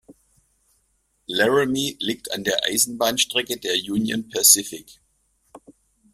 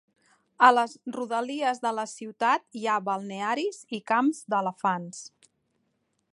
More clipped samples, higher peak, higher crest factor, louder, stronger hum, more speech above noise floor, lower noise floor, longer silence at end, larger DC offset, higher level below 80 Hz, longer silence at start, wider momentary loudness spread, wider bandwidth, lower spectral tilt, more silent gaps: neither; first, 0 dBFS vs -4 dBFS; about the same, 24 dB vs 24 dB; first, -20 LUFS vs -27 LUFS; neither; about the same, 46 dB vs 48 dB; second, -68 dBFS vs -75 dBFS; second, 0.4 s vs 1.05 s; neither; first, -62 dBFS vs -84 dBFS; second, 0.1 s vs 0.6 s; about the same, 13 LU vs 15 LU; first, 16 kHz vs 11.5 kHz; second, -1.5 dB/octave vs -4 dB/octave; neither